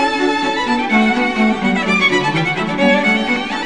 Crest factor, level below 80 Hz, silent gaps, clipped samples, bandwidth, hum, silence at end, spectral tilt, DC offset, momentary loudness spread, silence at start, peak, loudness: 14 dB; -46 dBFS; none; under 0.1%; 10 kHz; none; 0 s; -5 dB/octave; 0.9%; 4 LU; 0 s; 0 dBFS; -15 LUFS